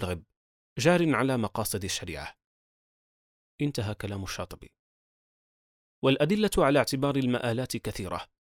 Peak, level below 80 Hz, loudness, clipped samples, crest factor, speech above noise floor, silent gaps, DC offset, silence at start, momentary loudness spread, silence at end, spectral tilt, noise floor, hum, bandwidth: -10 dBFS; -52 dBFS; -28 LUFS; under 0.1%; 20 dB; over 62 dB; 0.37-0.76 s, 2.44-3.58 s, 4.79-6.02 s; under 0.1%; 0 s; 15 LU; 0.3 s; -5 dB/octave; under -90 dBFS; none; 17.5 kHz